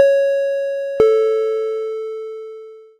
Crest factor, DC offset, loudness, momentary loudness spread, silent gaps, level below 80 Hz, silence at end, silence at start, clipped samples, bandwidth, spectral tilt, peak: 18 dB; under 0.1%; -18 LUFS; 18 LU; none; -56 dBFS; 0.15 s; 0 s; under 0.1%; 8.8 kHz; -4.5 dB/octave; 0 dBFS